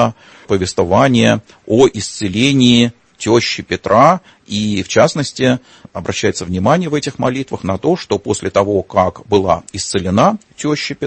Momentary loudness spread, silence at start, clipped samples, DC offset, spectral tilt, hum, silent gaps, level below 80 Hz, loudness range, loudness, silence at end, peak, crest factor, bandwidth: 9 LU; 0 s; under 0.1%; under 0.1%; -5 dB/octave; none; none; -46 dBFS; 4 LU; -15 LUFS; 0 s; 0 dBFS; 14 dB; 8.8 kHz